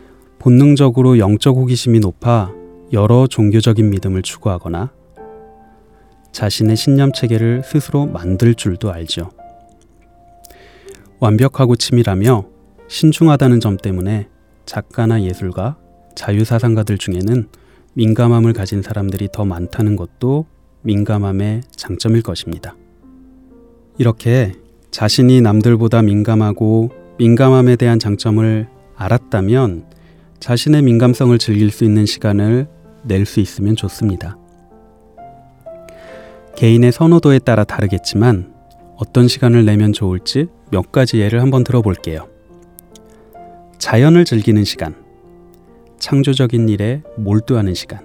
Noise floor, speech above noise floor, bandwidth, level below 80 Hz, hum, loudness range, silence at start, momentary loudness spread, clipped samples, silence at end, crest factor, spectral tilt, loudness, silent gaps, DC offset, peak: -48 dBFS; 35 dB; 14.5 kHz; -46 dBFS; none; 7 LU; 0.45 s; 14 LU; under 0.1%; 0.05 s; 14 dB; -7 dB/octave; -14 LUFS; none; 0.2%; 0 dBFS